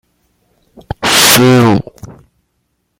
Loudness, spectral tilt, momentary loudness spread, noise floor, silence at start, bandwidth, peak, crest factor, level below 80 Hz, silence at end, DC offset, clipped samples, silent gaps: -8 LUFS; -3.5 dB/octave; 21 LU; -65 dBFS; 1 s; over 20 kHz; 0 dBFS; 12 dB; -42 dBFS; 0.9 s; under 0.1%; 0.2%; none